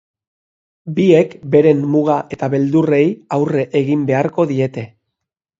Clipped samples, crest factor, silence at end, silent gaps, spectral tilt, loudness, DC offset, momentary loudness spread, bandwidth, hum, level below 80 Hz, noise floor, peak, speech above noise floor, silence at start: under 0.1%; 16 dB; 0.75 s; none; -8.5 dB/octave; -15 LUFS; under 0.1%; 9 LU; 7.8 kHz; none; -58 dBFS; -80 dBFS; 0 dBFS; 65 dB; 0.85 s